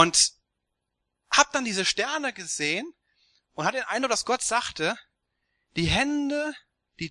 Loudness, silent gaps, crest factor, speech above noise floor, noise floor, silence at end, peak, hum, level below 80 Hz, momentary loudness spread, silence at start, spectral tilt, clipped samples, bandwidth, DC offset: -25 LUFS; none; 26 dB; 55 dB; -81 dBFS; 0 s; -2 dBFS; none; -52 dBFS; 14 LU; 0 s; -2 dB/octave; under 0.1%; 12 kHz; under 0.1%